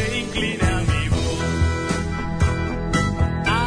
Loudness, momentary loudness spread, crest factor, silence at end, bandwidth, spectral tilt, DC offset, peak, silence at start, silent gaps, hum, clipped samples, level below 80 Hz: -22 LUFS; 4 LU; 14 dB; 0 s; 10.5 kHz; -5.5 dB/octave; under 0.1%; -8 dBFS; 0 s; none; none; under 0.1%; -28 dBFS